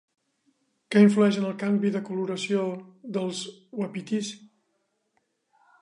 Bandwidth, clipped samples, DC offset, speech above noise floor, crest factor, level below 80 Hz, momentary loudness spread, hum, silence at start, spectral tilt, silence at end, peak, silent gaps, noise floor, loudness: 11 kHz; under 0.1%; under 0.1%; 50 dB; 20 dB; -78 dBFS; 17 LU; none; 0.9 s; -6 dB/octave; 1.35 s; -6 dBFS; none; -75 dBFS; -26 LUFS